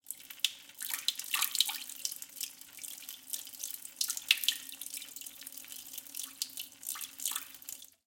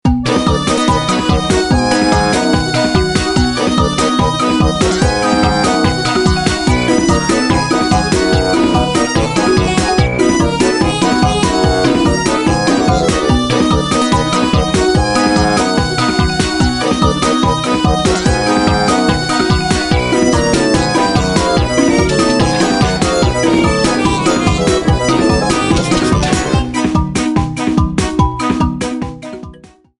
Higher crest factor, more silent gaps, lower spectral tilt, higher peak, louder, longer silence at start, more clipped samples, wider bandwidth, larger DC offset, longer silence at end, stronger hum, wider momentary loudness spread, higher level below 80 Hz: first, 32 dB vs 12 dB; neither; second, 3.5 dB/octave vs -5 dB/octave; second, -6 dBFS vs 0 dBFS; second, -36 LUFS vs -13 LUFS; about the same, 0.05 s vs 0.05 s; neither; first, 17 kHz vs 11.5 kHz; neither; second, 0.15 s vs 0.45 s; neither; first, 15 LU vs 2 LU; second, -88 dBFS vs -24 dBFS